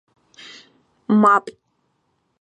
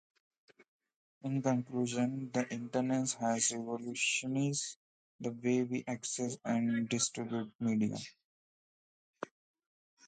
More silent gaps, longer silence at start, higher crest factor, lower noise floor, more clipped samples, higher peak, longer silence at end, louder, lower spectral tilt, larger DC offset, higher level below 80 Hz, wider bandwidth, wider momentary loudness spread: second, none vs 4.76-5.19 s, 7.55-7.59 s, 8.24-9.14 s; second, 1.1 s vs 1.25 s; about the same, 20 dB vs 18 dB; second, -69 dBFS vs under -90 dBFS; neither; first, -2 dBFS vs -18 dBFS; about the same, 0.9 s vs 0.8 s; first, -16 LUFS vs -35 LUFS; first, -7 dB/octave vs -4 dB/octave; neither; first, -72 dBFS vs -78 dBFS; about the same, 9.2 kHz vs 9.4 kHz; first, 26 LU vs 12 LU